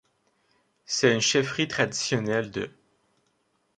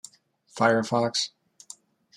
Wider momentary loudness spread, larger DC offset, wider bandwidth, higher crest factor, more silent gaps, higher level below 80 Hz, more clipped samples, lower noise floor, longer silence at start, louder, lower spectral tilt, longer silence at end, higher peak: second, 12 LU vs 23 LU; neither; second, 10.5 kHz vs 14.5 kHz; about the same, 22 dB vs 22 dB; neither; first, -64 dBFS vs -74 dBFS; neither; first, -71 dBFS vs -60 dBFS; first, 0.9 s vs 0.55 s; about the same, -25 LUFS vs -25 LUFS; about the same, -3.5 dB/octave vs -4 dB/octave; first, 1.1 s vs 0.9 s; about the same, -6 dBFS vs -6 dBFS